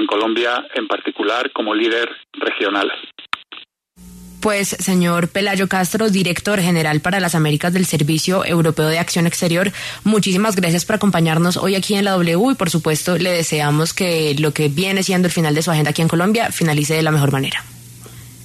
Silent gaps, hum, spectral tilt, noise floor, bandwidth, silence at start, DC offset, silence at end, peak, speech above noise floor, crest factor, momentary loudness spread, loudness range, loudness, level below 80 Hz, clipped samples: none; none; -4.5 dB/octave; -44 dBFS; 13.5 kHz; 0 s; under 0.1%; 0 s; -4 dBFS; 27 dB; 14 dB; 7 LU; 4 LU; -17 LUFS; -50 dBFS; under 0.1%